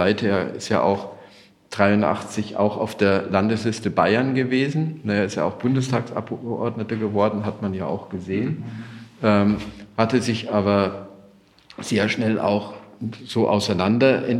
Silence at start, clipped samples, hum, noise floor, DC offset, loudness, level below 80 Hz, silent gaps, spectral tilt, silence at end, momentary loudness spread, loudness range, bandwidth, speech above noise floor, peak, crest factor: 0 s; under 0.1%; none; -52 dBFS; under 0.1%; -22 LUFS; -60 dBFS; none; -6.5 dB/octave; 0 s; 11 LU; 3 LU; 12 kHz; 31 dB; -2 dBFS; 20 dB